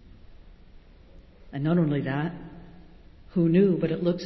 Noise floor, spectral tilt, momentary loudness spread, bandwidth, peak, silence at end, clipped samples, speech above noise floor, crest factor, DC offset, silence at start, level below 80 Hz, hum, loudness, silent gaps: -50 dBFS; -9.5 dB/octave; 18 LU; 6 kHz; -10 dBFS; 0 s; under 0.1%; 27 dB; 18 dB; under 0.1%; 0.3 s; -52 dBFS; none; -25 LUFS; none